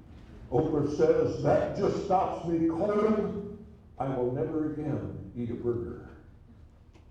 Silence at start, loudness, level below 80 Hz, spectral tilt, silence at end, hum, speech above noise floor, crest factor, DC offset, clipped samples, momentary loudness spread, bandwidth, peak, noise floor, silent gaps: 0 s; -29 LUFS; -52 dBFS; -8.5 dB/octave; 0.25 s; none; 25 dB; 18 dB; under 0.1%; under 0.1%; 13 LU; 8.8 kHz; -12 dBFS; -54 dBFS; none